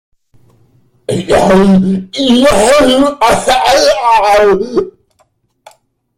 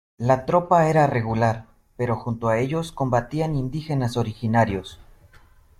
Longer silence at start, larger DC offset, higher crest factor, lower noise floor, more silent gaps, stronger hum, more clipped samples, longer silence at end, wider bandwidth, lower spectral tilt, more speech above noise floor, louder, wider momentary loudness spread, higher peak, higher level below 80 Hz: first, 1.1 s vs 0.2 s; neither; second, 10 dB vs 18 dB; first, -56 dBFS vs -52 dBFS; neither; neither; neither; first, 1.3 s vs 0.75 s; first, 16 kHz vs 13.5 kHz; second, -4.5 dB/octave vs -7.5 dB/octave; first, 48 dB vs 30 dB; first, -9 LUFS vs -22 LUFS; about the same, 10 LU vs 9 LU; first, 0 dBFS vs -6 dBFS; first, -34 dBFS vs -46 dBFS